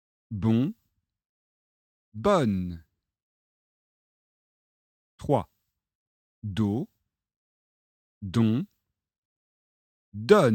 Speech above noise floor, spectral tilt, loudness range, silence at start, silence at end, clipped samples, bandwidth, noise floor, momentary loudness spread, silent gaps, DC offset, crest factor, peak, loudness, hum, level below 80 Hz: over 66 dB; -7.5 dB/octave; 7 LU; 0.3 s; 0 s; under 0.1%; 15.5 kHz; under -90 dBFS; 18 LU; 1.29-2.12 s, 3.23-5.18 s, 5.95-6.42 s, 7.36-8.21 s, 9.18-10.12 s; under 0.1%; 26 dB; -4 dBFS; -27 LUFS; none; -58 dBFS